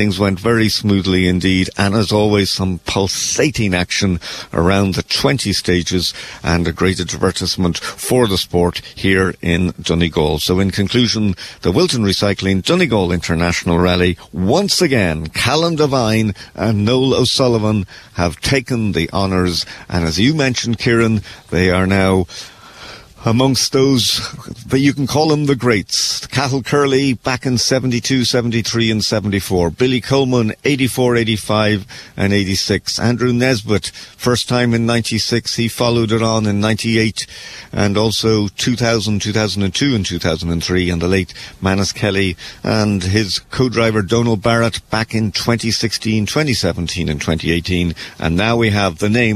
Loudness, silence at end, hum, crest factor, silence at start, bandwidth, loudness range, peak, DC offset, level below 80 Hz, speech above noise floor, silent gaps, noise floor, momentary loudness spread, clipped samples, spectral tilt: -16 LUFS; 0 s; none; 14 dB; 0 s; 14 kHz; 2 LU; -2 dBFS; under 0.1%; -38 dBFS; 21 dB; none; -36 dBFS; 6 LU; under 0.1%; -5 dB/octave